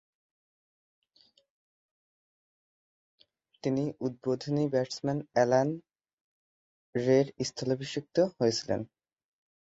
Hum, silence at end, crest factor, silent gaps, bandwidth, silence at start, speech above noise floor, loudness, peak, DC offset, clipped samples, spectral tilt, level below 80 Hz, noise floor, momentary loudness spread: none; 0.8 s; 22 dB; 6.13-6.93 s; 8 kHz; 3.65 s; 38 dB; -30 LUFS; -10 dBFS; under 0.1%; under 0.1%; -6 dB/octave; -70 dBFS; -67 dBFS; 9 LU